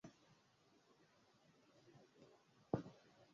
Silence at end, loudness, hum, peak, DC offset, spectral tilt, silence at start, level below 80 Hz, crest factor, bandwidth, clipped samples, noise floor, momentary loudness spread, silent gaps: 0.1 s; -49 LUFS; none; -24 dBFS; under 0.1%; -7.5 dB/octave; 0.05 s; -78 dBFS; 32 dB; 7.2 kHz; under 0.1%; -75 dBFS; 22 LU; none